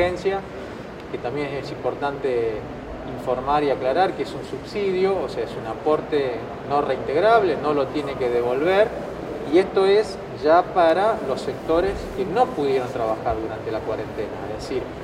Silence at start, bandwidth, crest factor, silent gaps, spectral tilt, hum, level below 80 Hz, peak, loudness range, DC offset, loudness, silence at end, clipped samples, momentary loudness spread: 0 s; 12.5 kHz; 18 dB; none; -6.5 dB/octave; none; -46 dBFS; -4 dBFS; 5 LU; under 0.1%; -23 LUFS; 0 s; under 0.1%; 13 LU